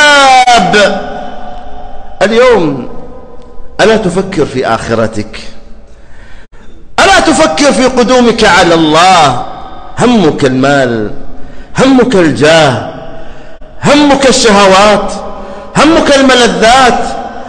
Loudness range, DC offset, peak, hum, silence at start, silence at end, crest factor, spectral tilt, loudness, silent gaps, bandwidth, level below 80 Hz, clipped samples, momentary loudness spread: 7 LU; under 0.1%; 0 dBFS; none; 0 s; 0 s; 8 dB; -4 dB/octave; -6 LUFS; none; 11.5 kHz; -28 dBFS; 0.4%; 19 LU